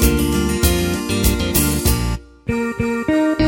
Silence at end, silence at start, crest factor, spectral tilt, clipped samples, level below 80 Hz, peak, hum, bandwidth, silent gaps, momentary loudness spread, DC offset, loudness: 0 s; 0 s; 16 dB; -4.5 dB/octave; under 0.1%; -24 dBFS; -2 dBFS; none; 17 kHz; none; 6 LU; under 0.1%; -18 LUFS